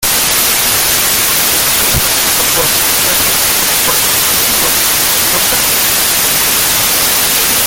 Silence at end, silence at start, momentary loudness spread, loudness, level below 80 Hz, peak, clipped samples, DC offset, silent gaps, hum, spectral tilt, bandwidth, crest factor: 0 s; 0 s; 0 LU; -8 LUFS; -34 dBFS; 0 dBFS; under 0.1%; under 0.1%; none; none; 0 dB/octave; over 20 kHz; 10 dB